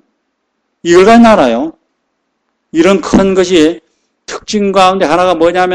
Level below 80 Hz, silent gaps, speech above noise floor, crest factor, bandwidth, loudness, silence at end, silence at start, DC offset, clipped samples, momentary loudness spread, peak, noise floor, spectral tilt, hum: -38 dBFS; none; 58 dB; 10 dB; 10.5 kHz; -8 LUFS; 0 s; 0.85 s; under 0.1%; 2%; 16 LU; 0 dBFS; -66 dBFS; -5 dB/octave; none